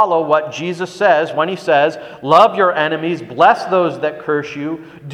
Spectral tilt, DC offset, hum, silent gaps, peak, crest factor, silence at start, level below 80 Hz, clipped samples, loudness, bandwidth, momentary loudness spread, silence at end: -5.5 dB/octave; under 0.1%; none; none; 0 dBFS; 16 dB; 0 s; -62 dBFS; under 0.1%; -15 LUFS; 11 kHz; 12 LU; 0 s